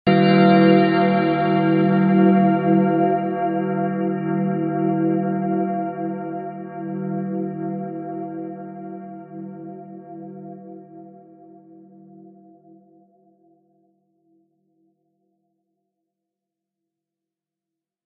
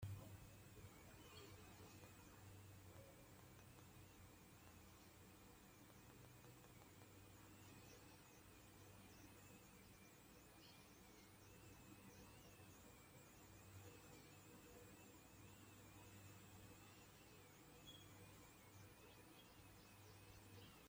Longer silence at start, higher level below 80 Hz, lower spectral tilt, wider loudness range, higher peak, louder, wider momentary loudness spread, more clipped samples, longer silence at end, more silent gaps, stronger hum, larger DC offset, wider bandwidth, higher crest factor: about the same, 0.05 s vs 0 s; first, -68 dBFS vs -76 dBFS; first, -12 dB/octave vs -4 dB/octave; first, 22 LU vs 2 LU; first, -4 dBFS vs -42 dBFS; first, -19 LUFS vs -64 LUFS; first, 22 LU vs 3 LU; neither; first, 6.95 s vs 0 s; neither; neither; neither; second, 4.9 kHz vs 16.5 kHz; about the same, 18 dB vs 22 dB